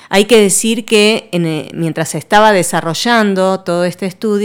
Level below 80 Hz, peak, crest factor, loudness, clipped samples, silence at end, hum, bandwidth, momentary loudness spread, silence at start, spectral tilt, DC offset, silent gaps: -48 dBFS; 0 dBFS; 12 dB; -12 LUFS; 0.1%; 0 s; none; 18.5 kHz; 10 LU; 0.1 s; -4 dB/octave; under 0.1%; none